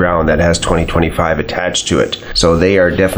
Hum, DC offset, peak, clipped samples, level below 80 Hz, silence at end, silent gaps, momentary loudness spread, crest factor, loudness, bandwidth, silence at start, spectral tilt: none; under 0.1%; 0 dBFS; under 0.1%; -28 dBFS; 0 s; none; 5 LU; 12 dB; -13 LUFS; over 20 kHz; 0 s; -4.5 dB/octave